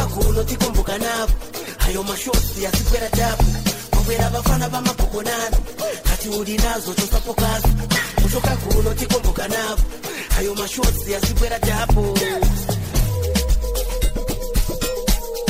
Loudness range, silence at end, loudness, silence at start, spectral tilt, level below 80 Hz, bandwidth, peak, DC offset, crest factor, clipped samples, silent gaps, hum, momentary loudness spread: 1 LU; 0 s; -21 LUFS; 0 s; -4.5 dB/octave; -22 dBFS; 16 kHz; -6 dBFS; 0.1%; 14 dB; under 0.1%; none; none; 5 LU